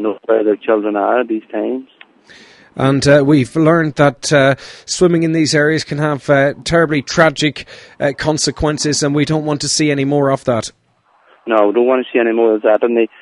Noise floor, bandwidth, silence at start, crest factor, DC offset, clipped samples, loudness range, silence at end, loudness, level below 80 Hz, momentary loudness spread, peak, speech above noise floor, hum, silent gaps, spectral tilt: -55 dBFS; 11.5 kHz; 0 s; 14 dB; under 0.1%; under 0.1%; 3 LU; 0.15 s; -14 LUFS; -42 dBFS; 8 LU; 0 dBFS; 41 dB; none; none; -5 dB/octave